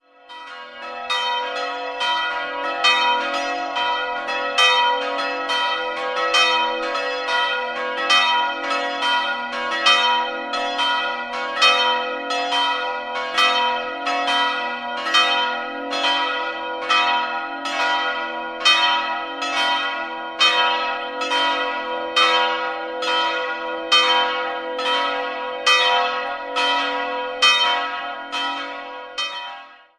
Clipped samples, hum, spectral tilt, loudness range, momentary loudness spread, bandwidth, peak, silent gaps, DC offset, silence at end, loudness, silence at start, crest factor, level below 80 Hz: under 0.1%; none; 0.5 dB/octave; 2 LU; 11 LU; 14 kHz; 0 dBFS; none; under 0.1%; 0.25 s; -19 LUFS; 0.3 s; 20 dB; -64 dBFS